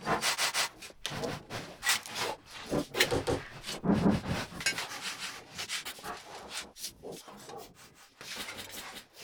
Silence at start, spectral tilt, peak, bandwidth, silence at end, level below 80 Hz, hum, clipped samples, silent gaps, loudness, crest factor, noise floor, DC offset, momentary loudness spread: 0 s; -3 dB/octave; -8 dBFS; over 20 kHz; 0 s; -56 dBFS; none; under 0.1%; none; -33 LUFS; 26 dB; -57 dBFS; under 0.1%; 17 LU